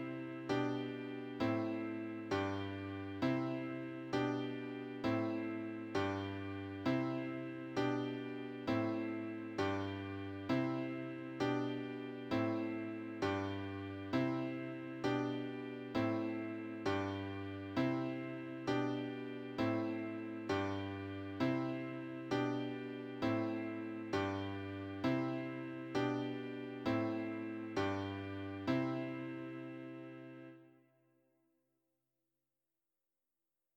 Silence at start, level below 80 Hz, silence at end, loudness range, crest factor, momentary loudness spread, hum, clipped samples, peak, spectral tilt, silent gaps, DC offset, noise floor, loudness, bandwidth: 0 s; -74 dBFS; 3.05 s; 2 LU; 18 dB; 8 LU; none; under 0.1%; -22 dBFS; -7 dB/octave; none; under 0.1%; under -90 dBFS; -40 LUFS; 8.8 kHz